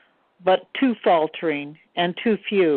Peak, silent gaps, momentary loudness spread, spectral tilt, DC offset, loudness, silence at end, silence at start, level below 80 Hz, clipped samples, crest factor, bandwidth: -6 dBFS; none; 7 LU; -9.5 dB/octave; under 0.1%; -22 LUFS; 0 s; 0.45 s; -68 dBFS; under 0.1%; 16 dB; 4.4 kHz